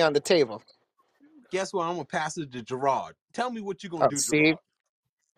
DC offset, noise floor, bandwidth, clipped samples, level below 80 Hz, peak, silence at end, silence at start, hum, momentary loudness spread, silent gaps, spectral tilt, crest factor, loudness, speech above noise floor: under 0.1%; -64 dBFS; 14.5 kHz; under 0.1%; -68 dBFS; -8 dBFS; 0.8 s; 0 s; none; 13 LU; 3.21-3.28 s; -3.5 dB/octave; 20 dB; -27 LUFS; 37 dB